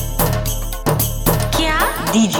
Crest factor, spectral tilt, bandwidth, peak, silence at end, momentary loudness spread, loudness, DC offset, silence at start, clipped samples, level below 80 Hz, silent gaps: 16 dB; -4.5 dB/octave; over 20 kHz; -2 dBFS; 0 s; 5 LU; -17 LUFS; under 0.1%; 0 s; under 0.1%; -24 dBFS; none